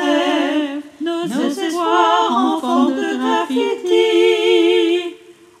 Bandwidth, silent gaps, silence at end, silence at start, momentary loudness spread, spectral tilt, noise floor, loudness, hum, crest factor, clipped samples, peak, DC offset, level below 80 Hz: 14 kHz; none; 0.3 s; 0 s; 8 LU; -3.5 dB/octave; -41 dBFS; -16 LUFS; none; 14 dB; under 0.1%; -2 dBFS; under 0.1%; -74 dBFS